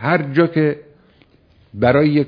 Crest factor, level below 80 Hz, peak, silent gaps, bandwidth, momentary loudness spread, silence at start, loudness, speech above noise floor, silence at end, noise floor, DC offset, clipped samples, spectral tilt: 18 dB; -52 dBFS; 0 dBFS; none; 5.2 kHz; 15 LU; 0 s; -16 LUFS; 37 dB; 0 s; -53 dBFS; under 0.1%; under 0.1%; -10 dB/octave